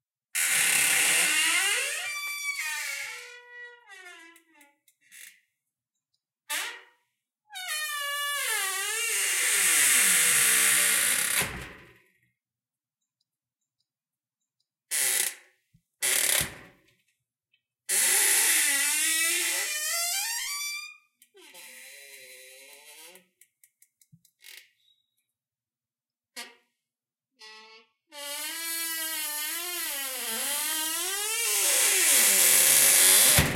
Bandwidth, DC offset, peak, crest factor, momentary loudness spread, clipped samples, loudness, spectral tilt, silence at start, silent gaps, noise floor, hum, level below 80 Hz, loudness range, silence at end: 16.5 kHz; under 0.1%; -6 dBFS; 22 dB; 20 LU; under 0.1%; -23 LUFS; 0.5 dB/octave; 0.35 s; none; under -90 dBFS; none; -58 dBFS; 18 LU; 0 s